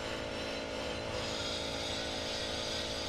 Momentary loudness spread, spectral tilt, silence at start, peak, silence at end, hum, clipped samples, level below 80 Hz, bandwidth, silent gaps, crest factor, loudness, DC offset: 3 LU; -3 dB/octave; 0 s; -24 dBFS; 0 s; none; under 0.1%; -54 dBFS; 15 kHz; none; 12 dB; -36 LUFS; under 0.1%